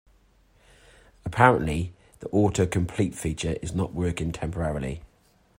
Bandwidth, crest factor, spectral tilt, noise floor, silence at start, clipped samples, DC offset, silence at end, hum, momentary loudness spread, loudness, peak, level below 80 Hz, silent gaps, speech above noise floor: 16 kHz; 24 dB; -6 dB/octave; -62 dBFS; 1.25 s; under 0.1%; under 0.1%; 0.55 s; none; 15 LU; -26 LUFS; -4 dBFS; -44 dBFS; none; 37 dB